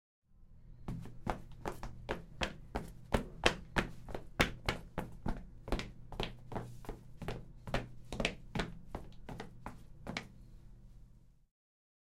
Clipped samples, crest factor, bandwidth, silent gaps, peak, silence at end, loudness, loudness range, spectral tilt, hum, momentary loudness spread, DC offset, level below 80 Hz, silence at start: under 0.1%; 32 dB; 16 kHz; none; -8 dBFS; 0.7 s; -41 LUFS; 7 LU; -4.5 dB/octave; none; 17 LU; under 0.1%; -48 dBFS; 0.3 s